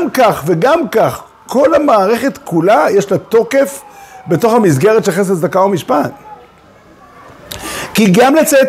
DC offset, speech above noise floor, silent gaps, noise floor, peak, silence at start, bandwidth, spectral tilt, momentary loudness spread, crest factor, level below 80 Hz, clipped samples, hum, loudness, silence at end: under 0.1%; 32 dB; none; -42 dBFS; 0 dBFS; 0 s; 16 kHz; -5.5 dB/octave; 13 LU; 12 dB; -48 dBFS; under 0.1%; none; -12 LUFS; 0 s